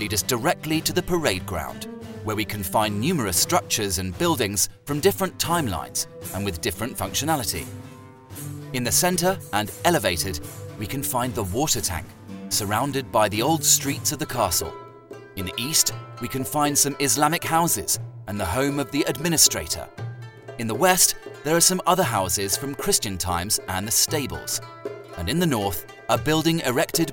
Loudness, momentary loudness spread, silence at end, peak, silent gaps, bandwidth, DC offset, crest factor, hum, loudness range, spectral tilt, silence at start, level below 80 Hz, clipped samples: -22 LUFS; 15 LU; 0 s; 0 dBFS; none; 17 kHz; under 0.1%; 24 dB; none; 4 LU; -3 dB/octave; 0 s; -46 dBFS; under 0.1%